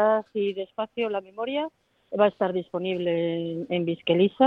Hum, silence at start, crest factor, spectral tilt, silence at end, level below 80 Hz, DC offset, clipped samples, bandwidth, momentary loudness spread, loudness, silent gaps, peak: none; 0 s; 20 dB; -8.5 dB/octave; 0 s; -70 dBFS; under 0.1%; under 0.1%; 4.9 kHz; 8 LU; -27 LUFS; none; -6 dBFS